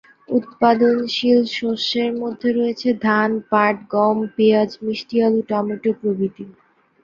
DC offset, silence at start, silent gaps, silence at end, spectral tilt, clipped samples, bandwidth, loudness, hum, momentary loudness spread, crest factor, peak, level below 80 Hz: under 0.1%; 0.3 s; none; 0.5 s; -6 dB/octave; under 0.1%; 7.2 kHz; -19 LUFS; none; 7 LU; 18 dB; -2 dBFS; -64 dBFS